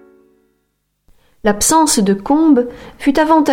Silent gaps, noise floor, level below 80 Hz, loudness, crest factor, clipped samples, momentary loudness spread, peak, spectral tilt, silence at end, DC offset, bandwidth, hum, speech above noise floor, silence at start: none; -67 dBFS; -42 dBFS; -13 LUFS; 14 dB; under 0.1%; 8 LU; -2 dBFS; -4 dB/octave; 0 s; under 0.1%; 17 kHz; 50 Hz at -40 dBFS; 55 dB; 1.45 s